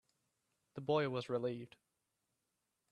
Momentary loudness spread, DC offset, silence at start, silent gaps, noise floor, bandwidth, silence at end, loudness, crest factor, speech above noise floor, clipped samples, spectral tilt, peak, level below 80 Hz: 18 LU; under 0.1%; 0.75 s; none; -87 dBFS; 11 kHz; 1.25 s; -39 LUFS; 20 dB; 48 dB; under 0.1%; -7 dB/octave; -22 dBFS; -82 dBFS